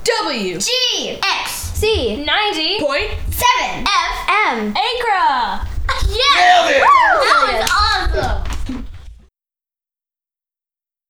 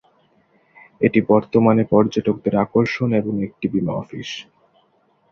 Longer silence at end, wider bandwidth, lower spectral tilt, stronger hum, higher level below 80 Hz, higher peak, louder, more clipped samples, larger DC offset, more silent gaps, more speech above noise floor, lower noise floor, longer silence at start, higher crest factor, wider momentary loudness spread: first, 1.95 s vs 0.9 s; first, over 20 kHz vs 6.8 kHz; second, -2.5 dB/octave vs -7.5 dB/octave; neither; first, -28 dBFS vs -54 dBFS; about the same, 0 dBFS vs -2 dBFS; first, -15 LUFS vs -19 LUFS; neither; neither; neither; first, over 75 dB vs 43 dB; first, under -90 dBFS vs -61 dBFS; second, 0 s vs 1 s; about the same, 16 dB vs 18 dB; about the same, 12 LU vs 13 LU